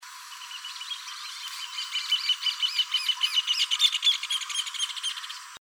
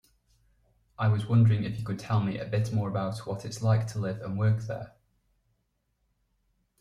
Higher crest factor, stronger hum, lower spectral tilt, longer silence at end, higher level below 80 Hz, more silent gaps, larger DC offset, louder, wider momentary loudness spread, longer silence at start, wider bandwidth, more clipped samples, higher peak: about the same, 20 dB vs 18 dB; neither; second, 7.5 dB/octave vs -7.5 dB/octave; second, 0.05 s vs 1.9 s; second, under -90 dBFS vs -60 dBFS; neither; neither; first, -26 LUFS vs -29 LUFS; about the same, 15 LU vs 13 LU; second, 0 s vs 1 s; first, over 20 kHz vs 11 kHz; neither; first, -8 dBFS vs -12 dBFS